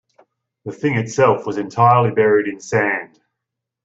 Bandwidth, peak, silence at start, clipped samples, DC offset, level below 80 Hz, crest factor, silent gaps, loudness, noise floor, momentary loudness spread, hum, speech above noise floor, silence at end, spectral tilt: 8 kHz; -2 dBFS; 0.65 s; under 0.1%; under 0.1%; -60 dBFS; 16 dB; none; -17 LUFS; -81 dBFS; 11 LU; none; 65 dB; 0.8 s; -6.5 dB/octave